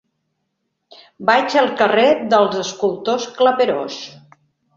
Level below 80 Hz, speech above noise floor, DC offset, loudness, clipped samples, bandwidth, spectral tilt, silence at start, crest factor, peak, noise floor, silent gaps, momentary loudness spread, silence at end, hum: -64 dBFS; 57 dB; under 0.1%; -16 LUFS; under 0.1%; 7.6 kHz; -4 dB/octave; 1.2 s; 18 dB; 0 dBFS; -73 dBFS; none; 10 LU; 0.65 s; none